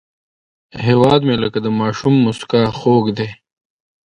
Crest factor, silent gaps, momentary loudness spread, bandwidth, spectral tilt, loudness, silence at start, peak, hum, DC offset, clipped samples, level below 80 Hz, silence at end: 16 dB; none; 9 LU; 10.5 kHz; -7.5 dB/octave; -15 LUFS; 0.75 s; 0 dBFS; none; under 0.1%; under 0.1%; -48 dBFS; 0.7 s